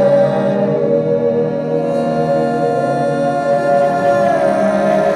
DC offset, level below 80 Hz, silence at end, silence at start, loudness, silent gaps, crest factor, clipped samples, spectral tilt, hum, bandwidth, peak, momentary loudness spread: under 0.1%; -52 dBFS; 0 s; 0 s; -15 LUFS; none; 10 dB; under 0.1%; -7.5 dB/octave; none; 10.5 kHz; -4 dBFS; 3 LU